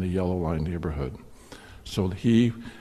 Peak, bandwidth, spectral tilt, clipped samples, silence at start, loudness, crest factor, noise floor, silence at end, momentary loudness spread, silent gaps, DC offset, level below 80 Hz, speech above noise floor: -10 dBFS; 13 kHz; -7.5 dB/octave; under 0.1%; 0 s; -27 LUFS; 18 dB; -46 dBFS; 0 s; 24 LU; none; under 0.1%; -44 dBFS; 20 dB